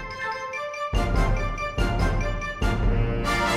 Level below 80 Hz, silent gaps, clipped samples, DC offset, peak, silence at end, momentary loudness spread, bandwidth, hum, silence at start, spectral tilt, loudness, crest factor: -28 dBFS; none; under 0.1%; under 0.1%; -10 dBFS; 0 s; 5 LU; 13.5 kHz; none; 0 s; -5.5 dB/octave; -26 LUFS; 14 dB